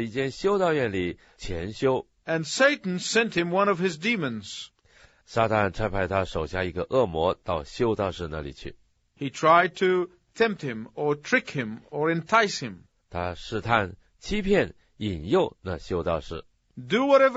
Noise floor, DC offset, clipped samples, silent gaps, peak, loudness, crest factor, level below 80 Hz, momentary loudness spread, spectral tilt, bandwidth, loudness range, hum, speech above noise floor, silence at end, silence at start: -58 dBFS; under 0.1%; under 0.1%; none; -4 dBFS; -26 LUFS; 22 dB; -48 dBFS; 14 LU; -4 dB/octave; 8 kHz; 3 LU; none; 32 dB; 0 s; 0 s